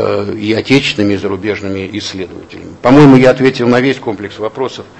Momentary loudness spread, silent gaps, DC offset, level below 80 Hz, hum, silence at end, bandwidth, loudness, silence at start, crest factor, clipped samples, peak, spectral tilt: 16 LU; none; under 0.1%; -44 dBFS; none; 0.15 s; 8.4 kHz; -11 LUFS; 0 s; 12 dB; 1%; 0 dBFS; -6.5 dB/octave